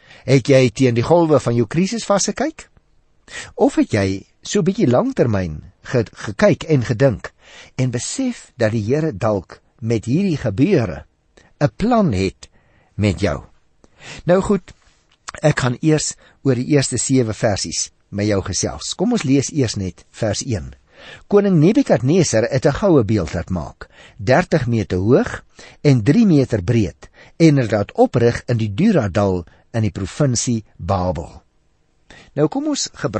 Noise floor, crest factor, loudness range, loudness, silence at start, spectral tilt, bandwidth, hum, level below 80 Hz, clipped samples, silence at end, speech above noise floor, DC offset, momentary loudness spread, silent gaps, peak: -60 dBFS; 16 dB; 4 LU; -18 LUFS; 0.25 s; -6 dB/octave; 8.8 kHz; none; -42 dBFS; under 0.1%; 0 s; 43 dB; under 0.1%; 12 LU; none; -2 dBFS